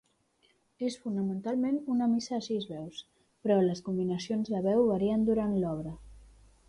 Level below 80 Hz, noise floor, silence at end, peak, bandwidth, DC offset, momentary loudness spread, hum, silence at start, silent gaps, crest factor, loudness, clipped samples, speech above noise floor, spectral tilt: -60 dBFS; -70 dBFS; 0.45 s; -16 dBFS; 11 kHz; under 0.1%; 12 LU; none; 0.8 s; none; 16 dB; -31 LUFS; under 0.1%; 40 dB; -7 dB/octave